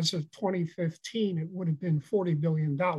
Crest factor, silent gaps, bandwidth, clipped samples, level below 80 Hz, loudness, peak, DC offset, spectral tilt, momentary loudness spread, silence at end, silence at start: 14 dB; none; 12 kHz; under 0.1%; -76 dBFS; -30 LUFS; -16 dBFS; under 0.1%; -6.5 dB/octave; 5 LU; 0 s; 0 s